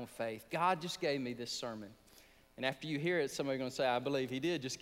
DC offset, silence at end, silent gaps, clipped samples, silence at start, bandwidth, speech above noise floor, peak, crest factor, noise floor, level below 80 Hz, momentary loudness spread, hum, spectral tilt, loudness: under 0.1%; 0 s; none; under 0.1%; 0 s; 16 kHz; 26 dB; -20 dBFS; 18 dB; -63 dBFS; -72 dBFS; 8 LU; none; -4.5 dB/octave; -37 LUFS